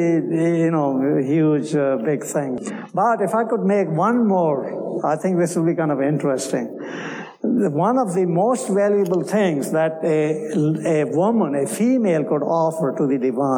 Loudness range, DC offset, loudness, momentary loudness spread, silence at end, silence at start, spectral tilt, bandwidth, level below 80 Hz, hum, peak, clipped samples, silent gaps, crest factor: 2 LU; under 0.1%; -20 LUFS; 6 LU; 0 s; 0 s; -7 dB/octave; 19 kHz; -72 dBFS; none; -8 dBFS; under 0.1%; none; 12 dB